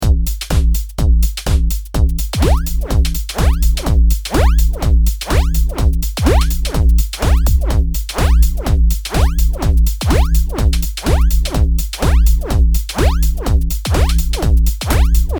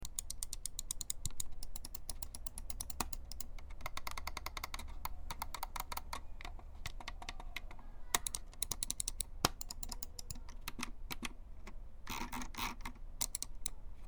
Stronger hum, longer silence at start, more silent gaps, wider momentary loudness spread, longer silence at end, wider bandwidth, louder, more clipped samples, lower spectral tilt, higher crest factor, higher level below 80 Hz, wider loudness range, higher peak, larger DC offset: neither; about the same, 0 s vs 0 s; neither; second, 3 LU vs 12 LU; about the same, 0 s vs 0 s; about the same, over 20 kHz vs over 20 kHz; first, -16 LUFS vs -43 LUFS; neither; first, -5.5 dB/octave vs -1.5 dB/octave; second, 12 dB vs 34 dB; first, -14 dBFS vs -48 dBFS; second, 1 LU vs 6 LU; first, 0 dBFS vs -8 dBFS; neither